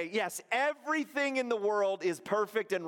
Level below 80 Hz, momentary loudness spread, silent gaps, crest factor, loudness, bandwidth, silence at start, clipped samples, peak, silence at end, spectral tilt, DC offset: -84 dBFS; 3 LU; none; 16 dB; -32 LUFS; 17 kHz; 0 s; under 0.1%; -16 dBFS; 0 s; -3.5 dB/octave; under 0.1%